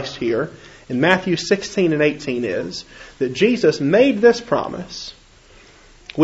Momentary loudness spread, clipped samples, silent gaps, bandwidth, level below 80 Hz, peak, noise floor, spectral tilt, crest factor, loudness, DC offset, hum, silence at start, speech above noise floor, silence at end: 16 LU; under 0.1%; none; 8 kHz; -52 dBFS; 0 dBFS; -48 dBFS; -5.5 dB/octave; 20 dB; -18 LUFS; under 0.1%; none; 0 s; 29 dB; 0 s